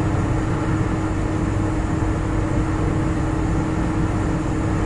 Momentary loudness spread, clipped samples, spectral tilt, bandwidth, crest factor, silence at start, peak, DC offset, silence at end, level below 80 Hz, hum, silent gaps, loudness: 1 LU; under 0.1%; -7.5 dB/octave; 11.5 kHz; 12 dB; 0 s; -8 dBFS; under 0.1%; 0 s; -28 dBFS; none; none; -22 LUFS